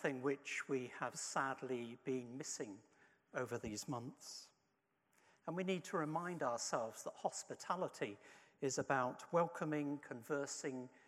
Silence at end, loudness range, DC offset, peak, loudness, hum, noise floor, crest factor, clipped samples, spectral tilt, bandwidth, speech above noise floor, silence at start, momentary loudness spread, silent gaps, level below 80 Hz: 0.1 s; 6 LU; under 0.1%; -24 dBFS; -43 LUFS; none; -83 dBFS; 20 dB; under 0.1%; -4 dB/octave; 15.5 kHz; 40 dB; 0 s; 10 LU; none; -80 dBFS